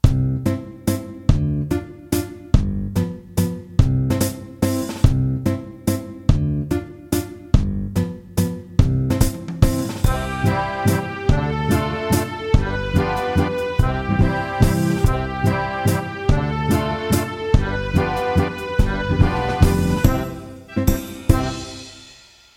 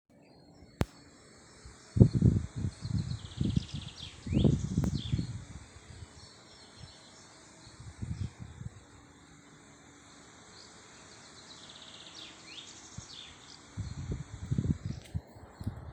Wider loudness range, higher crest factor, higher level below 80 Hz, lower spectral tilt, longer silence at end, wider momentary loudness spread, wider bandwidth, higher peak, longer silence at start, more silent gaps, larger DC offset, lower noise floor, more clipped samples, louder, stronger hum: second, 2 LU vs 18 LU; second, 18 dB vs 30 dB; first, -26 dBFS vs -46 dBFS; about the same, -6.5 dB/octave vs -7 dB/octave; first, 0.45 s vs 0 s; second, 6 LU vs 25 LU; first, 17 kHz vs 9.8 kHz; first, 0 dBFS vs -6 dBFS; second, 0.05 s vs 0.6 s; neither; neither; second, -47 dBFS vs -58 dBFS; neither; first, -21 LUFS vs -34 LUFS; neither